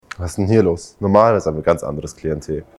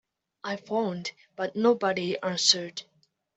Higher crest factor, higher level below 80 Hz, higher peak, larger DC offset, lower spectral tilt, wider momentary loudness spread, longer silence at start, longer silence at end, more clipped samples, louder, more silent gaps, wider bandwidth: second, 18 dB vs 24 dB; first, -42 dBFS vs -76 dBFS; first, 0 dBFS vs -4 dBFS; neither; first, -7 dB/octave vs -3 dB/octave; second, 13 LU vs 16 LU; second, 0.2 s vs 0.45 s; second, 0.15 s vs 0.55 s; neither; first, -18 LUFS vs -27 LUFS; neither; first, 12.5 kHz vs 8.2 kHz